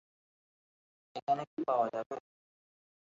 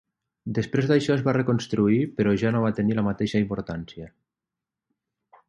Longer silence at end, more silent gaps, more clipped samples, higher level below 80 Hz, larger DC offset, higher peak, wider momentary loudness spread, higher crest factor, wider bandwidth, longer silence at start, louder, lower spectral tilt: second, 0.95 s vs 1.4 s; first, 1.22-1.27 s, 1.47-1.57 s, 2.06-2.10 s vs none; neither; second, -86 dBFS vs -54 dBFS; neither; second, -18 dBFS vs -8 dBFS; about the same, 13 LU vs 13 LU; about the same, 20 dB vs 18 dB; second, 7.4 kHz vs 10.5 kHz; first, 1.15 s vs 0.45 s; second, -35 LUFS vs -24 LUFS; second, -4.5 dB/octave vs -7.5 dB/octave